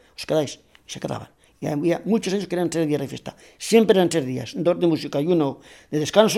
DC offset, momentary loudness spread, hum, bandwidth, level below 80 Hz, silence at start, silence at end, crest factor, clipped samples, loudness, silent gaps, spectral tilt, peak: under 0.1%; 16 LU; none; 16 kHz; -60 dBFS; 0.2 s; 0 s; 22 dB; under 0.1%; -22 LUFS; none; -5.5 dB/octave; 0 dBFS